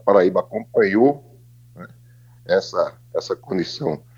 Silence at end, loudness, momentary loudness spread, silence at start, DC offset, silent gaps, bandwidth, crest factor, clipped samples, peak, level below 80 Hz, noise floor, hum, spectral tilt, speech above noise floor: 0.2 s; -20 LUFS; 17 LU; 0.05 s; under 0.1%; none; 7.4 kHz; 18 dB; under 0.1%; -2 dBFS; -62 dBFS; -48 dBFS; 60 Hz at -50 dBFS; -6 dB/octave; 29 dB